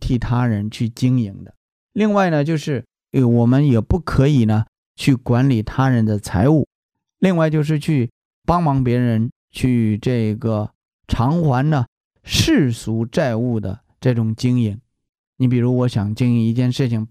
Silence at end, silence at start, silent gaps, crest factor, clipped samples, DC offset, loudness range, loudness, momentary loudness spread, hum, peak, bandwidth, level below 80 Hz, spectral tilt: 0.05 s; 0 s; 1.57-1.89 s, 4.68-4.95 s, 6.67-6.89 s, 8.10-8.42 s, 9.32-9.48 s, 10.75-10.99 s, 11.88-12.11 s, 15.09-15.33 s; 16 dB; under 0.1%; under 0.1%; 3 LU; -18 LUFS; 9 LU; none; -2 dBFS; 14.5 kHz; -38 dBFS; -7 dB/octave